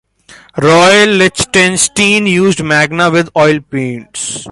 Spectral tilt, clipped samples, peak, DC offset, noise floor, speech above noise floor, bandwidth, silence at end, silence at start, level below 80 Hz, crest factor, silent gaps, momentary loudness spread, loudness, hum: -3.5 dB/octave; under 0.1%; 0 dBFS; under 0.1%; -41 dBFS; 30 dB; 11.5 kHz; 0 s; 0.55 s; -44 dBFS; 10 dB; none; 13 LU; -9 LUFS; none